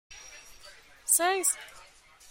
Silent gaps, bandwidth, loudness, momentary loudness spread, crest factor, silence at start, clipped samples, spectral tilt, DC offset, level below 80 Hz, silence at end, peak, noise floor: none; 16.5 kHz; -26 LUFS; 24 LU; 24 dB; 0.1 s; under 0.1%; 1 dB/octave; under 0.1%; -66 dBFS; 0.5 s; -10 dBFS; -55 dBFS